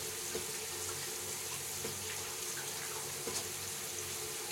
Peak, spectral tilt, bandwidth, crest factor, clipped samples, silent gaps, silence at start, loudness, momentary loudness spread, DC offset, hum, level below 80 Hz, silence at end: -24 dBFS; -1 dB/octave; 16.5 kHz; 18 dB; under 0.1%; none; 0 s; -38 LUFS; 1 LU; under 0.1%; none; -72 dBFS; 0 s